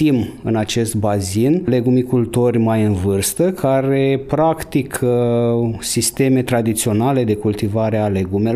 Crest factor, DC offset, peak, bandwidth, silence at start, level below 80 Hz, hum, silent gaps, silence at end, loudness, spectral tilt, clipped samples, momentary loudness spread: 12 dB; under 0.1%; -4 dBFS; 16 kHz; 0 s; -46 dBFS; none; none; 0 s; -17 LUFS; -6 dB/octave; under 0.1%; 3 LU